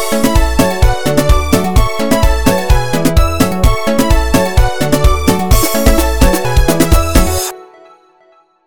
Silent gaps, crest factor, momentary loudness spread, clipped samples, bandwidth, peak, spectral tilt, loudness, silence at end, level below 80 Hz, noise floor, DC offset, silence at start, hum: none; 12 dB; 2 LU; 0.1%; 18 kHz; 0 dBFS; -5 dB/octave; -12 LUFS; 0 s; -14 dBFS; -49 dBFS; 8%; 0 s; none